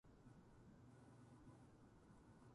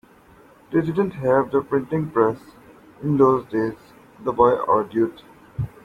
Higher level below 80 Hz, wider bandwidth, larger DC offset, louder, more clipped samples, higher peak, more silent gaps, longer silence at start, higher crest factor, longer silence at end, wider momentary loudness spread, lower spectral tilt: second, -76 dBFS vs -52 dBFS; about the same, 11 kHz vs 11.5 kHz; neither; second, -67 LUFS vs -21 LUFS; neither; second, -54 dBFS vs -4 dBFS; neither; second, 0.05 s vs 0.7 s; second, 12 dB vs 18 dB; second, 0 s vs 0.15 s; second, 3 LU vs 13 LU; second, -7 dB/octave vs -9.5 dB/octave